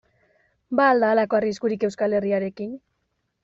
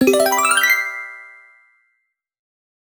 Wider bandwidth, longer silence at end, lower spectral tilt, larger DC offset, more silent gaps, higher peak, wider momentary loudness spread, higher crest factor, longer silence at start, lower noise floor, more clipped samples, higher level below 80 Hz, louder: second, 7.8 kHz vs over 20 kHz; second, 0.65 s vs 1.65 s; first, -4.5 dB/octave vs -1.5 dB/octave; neither; neither; second, -6 dBFS vs -2 dBFS; second, 15 LU vs 19 LU; about the same, 18 dB vs 18 dB; first, 0.7 s vs 0 s; about the same, -74 dBFS vs -72 dBFS; neither; about the same, -66 dBFS vs -62 dBFS; second, -22 LUFS vs -15 LUFS